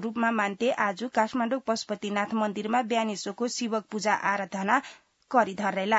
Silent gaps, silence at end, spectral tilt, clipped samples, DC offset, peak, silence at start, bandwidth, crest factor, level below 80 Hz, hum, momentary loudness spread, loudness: none; 0 s; -4 dB/octave; under 0.1%; under 0.1%; -8 dBFS; 0 s; 8 kHz; 20 dB; -76 dBFS; none; 5 LU; -28 LUFS